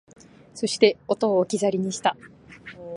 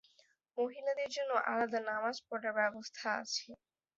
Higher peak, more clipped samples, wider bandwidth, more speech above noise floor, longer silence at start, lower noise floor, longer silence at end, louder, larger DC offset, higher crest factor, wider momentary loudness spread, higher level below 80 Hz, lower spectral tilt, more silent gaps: first, -2 dBFS vs -18 dBFS; neither; first, 11.5 kHz vs 7.6 kHz; second, 21 dB vs 34 dB; about the same, 0.55 s vs 0.55 s; second, -44 dBFS vs -71 dBFS; second, 0 s vs 0.4 s; first, -23 LUFS vs -37 LUFS; neither; about the same, 22 dB vs 20 dB; first, 22 LU vs 6 LU; first, -66 dBFS vs -84 dBFS; first, -4.5 dB/octave vs 0 dB/octave; neither